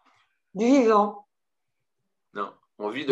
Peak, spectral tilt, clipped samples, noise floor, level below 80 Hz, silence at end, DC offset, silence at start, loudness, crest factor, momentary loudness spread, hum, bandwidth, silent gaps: -8 dBFS; -5.5 dB/octave; under 0.1%; -86 dBFS; -86 dBFS; 0 s; under 0.1%; 0.55 s; -23 LUFS; 20 dB; 19 LU; none; 8 kHz; none